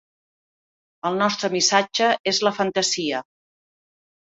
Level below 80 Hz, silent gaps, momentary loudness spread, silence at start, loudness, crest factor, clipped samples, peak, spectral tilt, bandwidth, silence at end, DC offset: -68 dBFS; 2.20-2.24 s; 9 LU; 1.05 s; -21 LUFS; 22 dB; under 0.1%; -2 dBFS; -2.5 dB/octave; 8.2 kHz; 1.1 s; under 0.1%